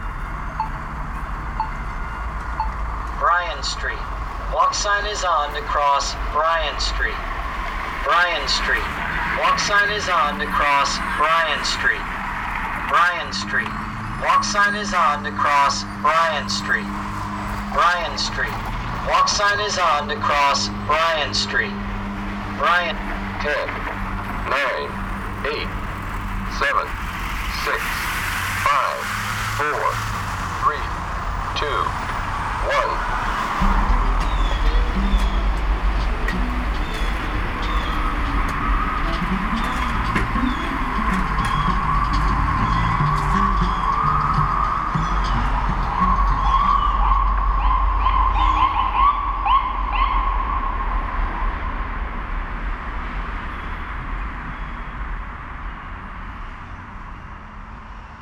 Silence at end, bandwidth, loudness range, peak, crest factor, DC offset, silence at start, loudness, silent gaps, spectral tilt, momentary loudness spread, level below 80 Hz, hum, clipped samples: 0 s; 16.5 kHz; 7 LU; -6 dBFS; 16 dB; under 0.1%; 0 s; -21 LUFS; none; -4 dB/octave; 12 LU; -26 dBFS; none; under 0.1%